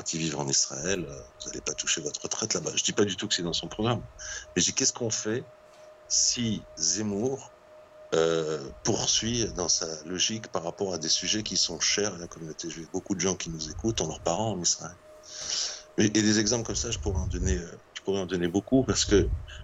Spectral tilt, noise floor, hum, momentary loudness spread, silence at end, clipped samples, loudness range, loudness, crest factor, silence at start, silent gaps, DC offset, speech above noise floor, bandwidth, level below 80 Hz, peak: -3 dB/octave; -52 dBFS; none; 11 LU; 0 s; under 0.1%; 2 LU; -27 LUFS; 18 dB; 0 s; none; under 0.1%; 23 dB; 8.8 kHz; -44 dBFS; -10 dBFS